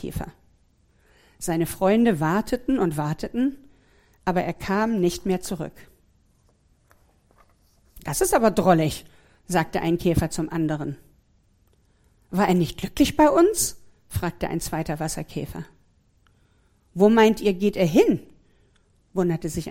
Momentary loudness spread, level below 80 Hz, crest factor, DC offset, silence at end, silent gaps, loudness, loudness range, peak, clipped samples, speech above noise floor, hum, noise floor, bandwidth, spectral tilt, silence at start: 15 LU; -44 dBFS; 20 dB; under 0.1%; 0 s; none; -23 LUFS; 6 LU; -4 dBFS; under 0.1%; 40 dB; none; -62 dBFS; 16.5 kHz; -5.5 dB/octave; 0 s